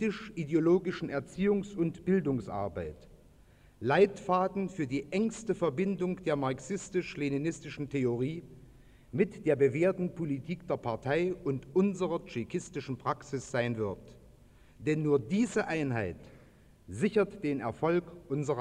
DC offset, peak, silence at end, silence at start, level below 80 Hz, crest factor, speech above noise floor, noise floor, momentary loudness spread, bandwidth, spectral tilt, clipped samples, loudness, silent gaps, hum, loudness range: under 0.1%; -12 dBFS; 0 s; 0 s; -60 dBFS; 20 dB; 28 dB; -59 dBFS; 10 LU; 10.5 kHz; -7 dB/octave; under 0.1%; -32 LUFS; none; none; 3 LU